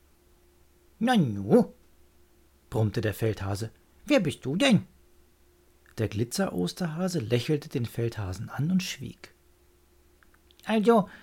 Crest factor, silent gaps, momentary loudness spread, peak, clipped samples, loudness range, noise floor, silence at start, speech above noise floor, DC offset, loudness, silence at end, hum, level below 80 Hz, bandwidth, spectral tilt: 20 dB; none; 12 LU; -8 dBFS; under 0.1%; 3 LU; -61 dBFS; 1 s; 35 dB; under 0.1%; -27 LUFS; 0.05 s; none; -58 dBFS; 17 kHz; -6 dB/octave